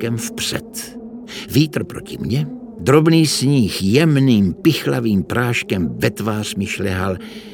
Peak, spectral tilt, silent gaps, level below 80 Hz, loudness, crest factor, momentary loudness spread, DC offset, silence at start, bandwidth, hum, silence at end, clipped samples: 0 dBFS; -5.5 dB/octave; none; -46 dBFS; -17 LUFS; 18 dB; 15 LU; under 0.1%; 0 s; 18.5 kHz; none; 0 s; under 0.1%